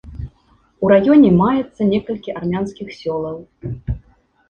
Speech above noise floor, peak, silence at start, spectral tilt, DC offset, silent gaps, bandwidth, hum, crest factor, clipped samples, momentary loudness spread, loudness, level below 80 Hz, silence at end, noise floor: 40 dB; -2 dBFS; 0.05 s; -9 dB/octave; under 0.1%; none; 6.8 kHz; none; 16 dB; under 0.1%; 20 LU; -17 LUFS; -38 dBFS; 0.5 s; -56 dBFS